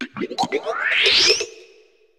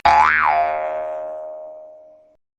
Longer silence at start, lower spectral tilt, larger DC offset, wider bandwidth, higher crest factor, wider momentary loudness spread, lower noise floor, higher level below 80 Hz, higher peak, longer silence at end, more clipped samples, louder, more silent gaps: about the same, 0 s vs 0.05 s; second, -0.5 dB/octave vs -3.5 dB/octave; neither; first, 18 kHz vs 8.6 kHz; about the same, 20 dB vs 16 dB; second, 14 LU vs 23 LU; first, -54 dBFS vs -48 dBFS; second, -60 dBFS vs -50 dBFS; about the same, -2 dBFS vs -4 dBFS; about the same, 0.55 s vs 0.6 s; neither; about the same, -17 LUFS vs -18 LUFS; neither